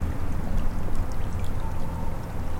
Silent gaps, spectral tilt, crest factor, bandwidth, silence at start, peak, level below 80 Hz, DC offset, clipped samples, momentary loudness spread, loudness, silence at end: none; -7 dB/octave; 12 dB; 9.8 kHz; 0 s; -12 dBFS; -28 dBFS; under 0.1%; under 0.1%; 2 LU; -32 LUFS; 0 s